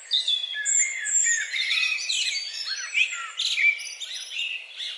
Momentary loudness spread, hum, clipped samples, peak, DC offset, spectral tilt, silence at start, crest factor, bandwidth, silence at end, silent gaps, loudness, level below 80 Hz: 10 LU; none; under 0.1%; -10 dBFS; under 0.1%; 11 dB/octave; 0 s; 16 dB; 11.5 kHz; 0 s; none; -23 LUFS; under -90 dBFS